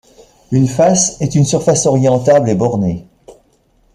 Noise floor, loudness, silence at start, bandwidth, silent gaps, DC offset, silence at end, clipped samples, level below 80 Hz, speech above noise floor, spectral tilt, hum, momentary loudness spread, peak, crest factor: -55 dBFS; -13 LUFS; 0.5 s; 12.5 kHz; none; under 0.1%; 0.65 s; under 0.1%; -44 dBFS; 42 dB; -5.5 dB/octave; none; 7 LU; -2 dBFS; 12 dB